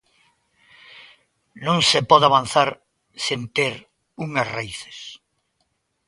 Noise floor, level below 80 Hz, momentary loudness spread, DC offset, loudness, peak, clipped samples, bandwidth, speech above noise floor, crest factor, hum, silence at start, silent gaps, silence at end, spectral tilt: -71 dBFS; -60 dBFS; 21 LU; under 0.1%; -19 LUFS; 0 dBFS; under 0.1%; 11.5 kHz; 51 dB; 24 dB; none; 0.95 s; none; 0.9 s; -3.5 dB/octave